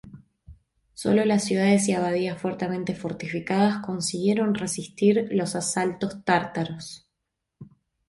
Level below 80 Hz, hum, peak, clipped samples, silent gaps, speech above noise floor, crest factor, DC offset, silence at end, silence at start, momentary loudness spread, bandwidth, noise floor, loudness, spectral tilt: -60 dBFS; none; -8 dBFS; under 0.1%; none; 58 dB; 18 dB; under 0.1%; 0.45 s; 0.05 s; 10 LU; 11.5 kHz; -82 dBFS; -25 LUFS; -5 dB/octave